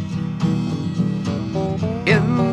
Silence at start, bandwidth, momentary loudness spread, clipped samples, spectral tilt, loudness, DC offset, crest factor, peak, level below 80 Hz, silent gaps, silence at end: 0 s; 9.2 kHz; 7 LU; under 0.1%; -7.5 dB/octave; -21 LUFS; under 0.1%; 18 dB; -2 dBFS; -44 dBFS; none; 0 s